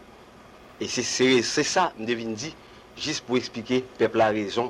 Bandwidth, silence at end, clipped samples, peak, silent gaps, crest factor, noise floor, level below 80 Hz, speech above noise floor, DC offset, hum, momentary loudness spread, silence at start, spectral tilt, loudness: 12.5 kHz; 0 s; under 0.1%; -10 dBFS; none; 16 dB; -49 dBFS; -60 dBFS; 24 dB; under 0.1%; none; 13 LU; 0 s; -3.5 dB/octave; -25 LUFS